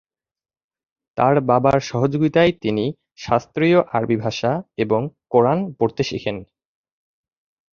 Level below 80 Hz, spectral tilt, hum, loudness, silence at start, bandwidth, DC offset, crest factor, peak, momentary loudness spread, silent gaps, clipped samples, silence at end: -52 dBFS; -7 dB/octave; none; -19 LUFS; 1.15 s; 7.2 kHz; under 0.1%; 18 dB; -2 dBFS; 9 LU; none; under 0.1%; 1.35 s